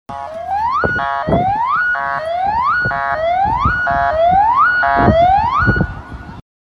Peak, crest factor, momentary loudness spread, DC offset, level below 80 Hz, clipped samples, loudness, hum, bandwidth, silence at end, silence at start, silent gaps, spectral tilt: 0 dBFS; 14 dB; 10 LU; under 0.1%; -32 dBFS; under 0.1%; -14 LUFS; none; 7 kHz; 0.3 s; 0.1 s; none; -7.5 dB/octave